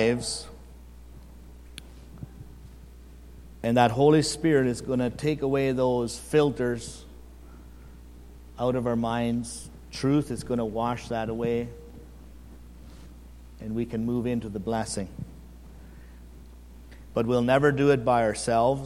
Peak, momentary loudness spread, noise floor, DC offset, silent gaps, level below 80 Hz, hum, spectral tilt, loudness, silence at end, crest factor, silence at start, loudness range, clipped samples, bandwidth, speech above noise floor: -4 dBFS; 25 LU; -46 dBFS; under 0.1%; none; -48 dBFS; 60 Hz at -45 dBFS; -6 dB/octave; -26 LUFS; 0 s; 24 dB; 0 s; 9 LU; under 0.1%; 15.5 kHz; 21 dB